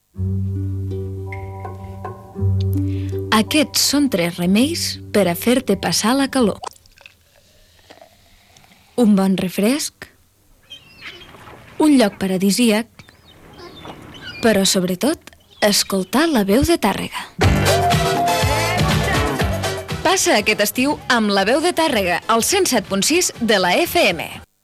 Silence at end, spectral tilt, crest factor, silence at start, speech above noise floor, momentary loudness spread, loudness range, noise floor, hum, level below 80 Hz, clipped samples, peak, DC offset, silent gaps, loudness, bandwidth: 0.2 s; -4 dB/octave; 16 dB; 0.15 s; 37 dB; 16 LU; 5 LU; -54 dBFS; none; -38 dBFS; under 0.1%; -4 dBFS; under 0.1%; none; -17 LUFS; 15.5 kHz